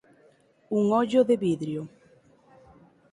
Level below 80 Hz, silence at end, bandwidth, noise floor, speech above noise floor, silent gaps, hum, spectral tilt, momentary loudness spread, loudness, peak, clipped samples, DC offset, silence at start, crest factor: -68 dBFS; 1.25 s; 11.5 kHz; -61 dBFS; 37 dB; none; none; -7.5 dB/octave; 13 LU; -25 LUFS; -10 dBFS; under 0.1%; under 0.1%; 0.7 s; 18 dB